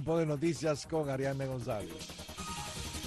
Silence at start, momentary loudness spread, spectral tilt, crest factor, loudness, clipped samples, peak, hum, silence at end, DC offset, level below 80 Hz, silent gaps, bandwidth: 0 s; 10 LU; -5.5 dB/octave; 14 dB; -36 LUFS; under 0.1%; -20 dBFS; none; 0 s; under 0.1%; -54 dBFS; none; 12.5 kHz